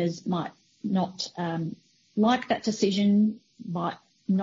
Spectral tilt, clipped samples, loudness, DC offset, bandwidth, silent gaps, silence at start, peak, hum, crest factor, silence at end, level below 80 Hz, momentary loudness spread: -6 dB/octave; under 0.1%; -27 LUFS; under 0.1%; 7.6 kHz; none; 0 s; -10 dBFS; none; 16 dB; 0 s; -70 dBFS; 15 LU